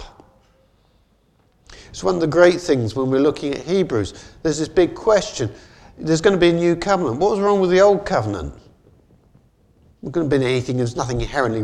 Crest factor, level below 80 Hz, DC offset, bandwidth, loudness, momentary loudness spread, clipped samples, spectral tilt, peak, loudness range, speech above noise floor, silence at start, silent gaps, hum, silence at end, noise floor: 20 dB; -42 dBFS; under 0.1%; 10.5 kHz; -19 LUFS; 12 LU; under 0.1%; -6 dB/octave; 0 dBFS; 4 LU; 41 dB; 0 s; none; none; 0 s; -59 dBFS